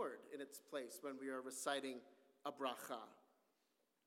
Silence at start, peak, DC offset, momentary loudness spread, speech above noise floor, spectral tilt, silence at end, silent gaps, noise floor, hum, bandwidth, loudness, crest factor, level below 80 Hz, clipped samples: 0 s; -28 dBFS; under 0.1%; 10 LU; 36 dB; -2 dB/octave; 0.85 s; none; -84 dBFS; none; 17.5 kHz; -49 LUFS; 22 dB; under -90 dBFS; under 0.1%